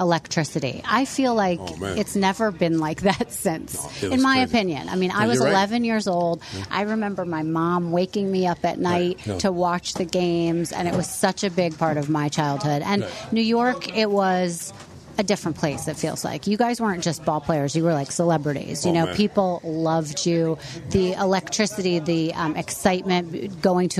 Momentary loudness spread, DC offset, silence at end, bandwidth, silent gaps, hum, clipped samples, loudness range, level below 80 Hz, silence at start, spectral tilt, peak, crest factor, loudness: 6 LU; under 0.1%; 0 s; 13.5 kHz; none; none; under 0.1%; 2 LU; -52 dBFS; 0 s; -5 dB/octave; -4 dBFS; 18 dB; -23 LUFS